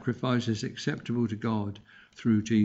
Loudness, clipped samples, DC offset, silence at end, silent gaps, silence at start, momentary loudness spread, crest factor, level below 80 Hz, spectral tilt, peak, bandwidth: -30 LUFS; under 0.1%; under 0.1%; 0 s; none; 0 s; 6 LU; 14 dB; -64 dBFS; -6.5 dB/octave; -14 dBFS; 8 kHz